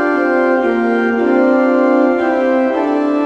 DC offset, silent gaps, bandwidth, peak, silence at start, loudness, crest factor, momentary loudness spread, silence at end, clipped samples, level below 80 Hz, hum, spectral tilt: under 0.1%; none; 7.6 kHz; 0 dBFS; 0 s; -13 LUFS; 12 dB; 3 LU; 0 s; under 0.1%; -54 dBFS; none; -6.5 dB/octave